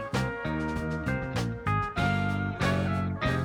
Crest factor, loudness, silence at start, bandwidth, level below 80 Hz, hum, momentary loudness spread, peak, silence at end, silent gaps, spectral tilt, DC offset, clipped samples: 14 dB; -29 LUFS; 0 s; 16.5 kHz; -44 dBFS; none; 4 LU; -14 dBFS; 0 s; none; -6.5 dB/octave; under 0.1%; under 0.1%